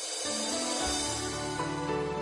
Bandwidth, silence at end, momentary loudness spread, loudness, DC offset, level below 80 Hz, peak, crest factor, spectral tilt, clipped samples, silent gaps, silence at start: 11.5 kHz; 0 s; 4 LU; -31 LUFS; under 0.1%; -52 dBFS; -18 dBFS; 14 dB; -2.5 dB/octave; under 0.1%; none; 0 s